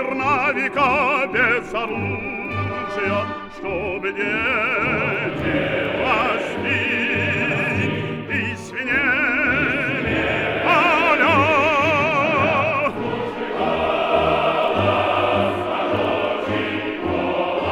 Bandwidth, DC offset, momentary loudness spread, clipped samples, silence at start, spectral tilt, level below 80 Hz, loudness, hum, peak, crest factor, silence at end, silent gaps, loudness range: 15.5 kHz; under 0.1%; 9 LU; under 0.1%; 0 s; -6 dB/octave; -46 dBFS; -19 LUFS; none; -4 dBFS; 16 dB; 0 s; none; 5 LU